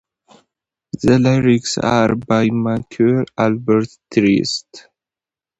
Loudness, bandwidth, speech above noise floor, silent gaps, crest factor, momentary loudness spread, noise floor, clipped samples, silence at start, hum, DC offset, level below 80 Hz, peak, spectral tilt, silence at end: -16 LUFS; 8.2 kHz; 74 dB; none; 16 dB; 7 LU; -90 dBFS; under 0.1%; 0.95 s; none; under 0.1%; -48 dBFS; 0 dBFS; -6 dB/octave; 0.8 s